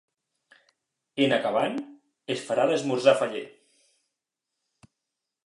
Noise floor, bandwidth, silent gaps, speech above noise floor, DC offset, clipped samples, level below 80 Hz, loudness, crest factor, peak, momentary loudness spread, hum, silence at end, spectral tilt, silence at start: -85 dBFS; 11.5 kHz; none; 61 dB; under 0.1%; under 0.1%; -82 dBFS; -25 LUFS; 24 dB; -6 dBFS; 19 LU; none; 1.95 s; -4.5 dB/octave; 1.15 s